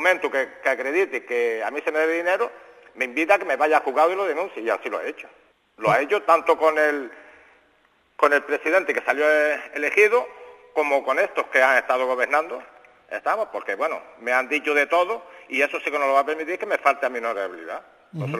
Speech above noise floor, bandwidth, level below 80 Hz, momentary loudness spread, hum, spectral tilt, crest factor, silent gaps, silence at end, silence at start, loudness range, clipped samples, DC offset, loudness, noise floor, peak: 40 dB; 14 kHz; -72 dBFS; 11 LU; none; -4.5 dB/octave; 20 dB; none; 0 s; 0 s; 3 LU; under 0.1%; under 0.1%; -22 LUFS; -62 dBFS; -2 dBFS